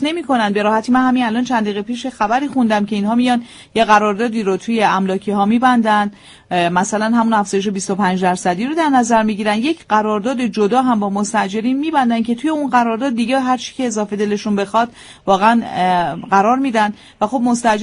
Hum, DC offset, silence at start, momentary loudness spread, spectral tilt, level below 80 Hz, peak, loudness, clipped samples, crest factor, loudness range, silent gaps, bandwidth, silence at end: none; under 0.1%; 0 s; 6 LU; -5 dB/octave; -54 dBFS; 0 dBFS; -16 LUFS; under 0.1%; 16 dB; 2 LU; none; 10.5 kHz; 0 s